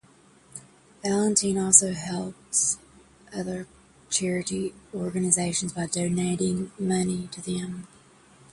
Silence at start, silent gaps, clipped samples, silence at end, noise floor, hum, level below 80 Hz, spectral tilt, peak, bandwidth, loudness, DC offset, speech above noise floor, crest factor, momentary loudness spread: 0.55 s; none; under 0.1%; 0.65 s; -57 dBFS; none; -58 dBFS; -3.5 dB/octave; 0 dBFS; 11.5 kHz; -25 LUFS; under 0.1%; 31 dB; 26 dB; 17 LU